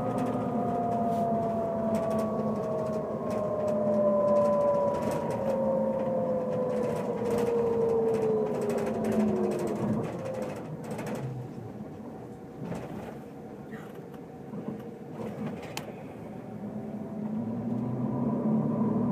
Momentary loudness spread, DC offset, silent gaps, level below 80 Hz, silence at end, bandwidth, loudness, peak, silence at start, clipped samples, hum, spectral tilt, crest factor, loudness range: 15 LU; under 0.1%; none; -60 dBFS; 0 s; 15.5 kHz; -30 LUFS; -16 dBFS; 0 s; under 0.1%; none; -8 dB/octave; 14 dB; 12 LU